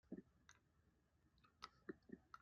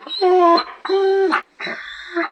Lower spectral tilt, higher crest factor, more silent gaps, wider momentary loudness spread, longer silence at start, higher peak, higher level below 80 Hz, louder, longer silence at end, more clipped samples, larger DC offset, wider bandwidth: about the same, -4.5 dB/octave vs -4 dB/octave; first, 28 dB vs 16 dB; neither; second, 4 LU vs 14 LU; about the same, 0.05 s vs 0 s; second, -36 dBFS vs -2 dBFS; second, -84 dBFS vs -64 dBFS; second, -61 LUFS vs -17 LUFS; about the same, 0 s vs 0 s; neither; neither; second, 6.8 kHz vs 9 kHz